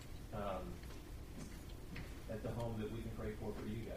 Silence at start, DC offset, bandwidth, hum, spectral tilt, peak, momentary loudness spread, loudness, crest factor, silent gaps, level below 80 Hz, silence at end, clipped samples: 0 s; under 0.1%; 15.5 kHz; none; -6.5 dB/octave; -30 dBFS; 9 LU; -47 LUFS; 16 dB; none; -52 dBFS; 0 s; under 0.1%